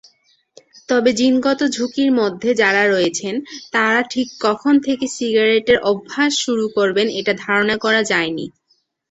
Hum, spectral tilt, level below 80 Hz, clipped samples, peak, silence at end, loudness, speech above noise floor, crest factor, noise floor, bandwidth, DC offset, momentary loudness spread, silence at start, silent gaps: none; -3.5 dB/octave; -58 dBFS; under 0.1%; -2 dBFS; 0.6 s; -17 LUFS; 47 dB; 16 dB; -64 dBFS; 8.2 kHz; under 0.1%; 7 LU; 0.9 s; none